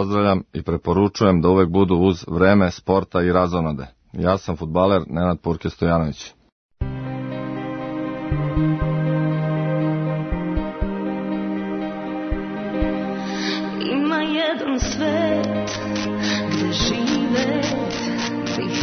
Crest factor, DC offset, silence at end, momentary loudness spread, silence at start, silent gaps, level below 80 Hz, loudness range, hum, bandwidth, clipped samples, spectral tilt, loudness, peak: 20 dB; under 0.1%; 0 s; 10 LU; 0 s; 6.52-6.69 s; -36 dBFS; 7 LU; none; 6.6 kHz; under 0.1%; -6 dB/octave; -21 LUFS; -2 dBFS